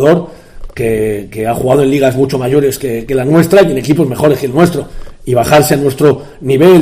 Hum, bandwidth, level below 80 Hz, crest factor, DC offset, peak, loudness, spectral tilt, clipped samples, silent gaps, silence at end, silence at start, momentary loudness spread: none; 16 kHz; -34 dBFS; 10 dB; under 0.1%; 0 dBFS; -11 LUFS; -6.5 dB/octave; 0.5%; none; 0 s; 0 s; 10 LU